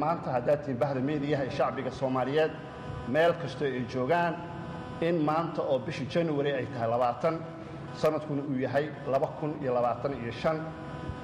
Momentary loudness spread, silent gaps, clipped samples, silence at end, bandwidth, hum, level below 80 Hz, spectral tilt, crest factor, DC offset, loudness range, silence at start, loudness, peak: 11 LU; none; under 0.1%; 0 s; 15 kHz; none; -58 dBFS; -7.5 dB/octave; 14 dB; under 0.1%; 1 LU; 0 s; -30 LUFS; -16 dBFS